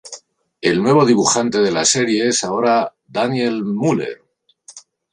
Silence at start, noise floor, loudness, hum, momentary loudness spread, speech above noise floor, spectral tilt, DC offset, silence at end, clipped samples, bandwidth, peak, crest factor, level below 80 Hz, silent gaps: 0.05 s; -47 dBFS; -16 LUFS; none; 11 LU; 32 dB; -4 dB/octave; under 0.1%; 0.35 s; under 0.1%; 11 kHz; -2 dBFS; 16 dB; -60 dBFS; none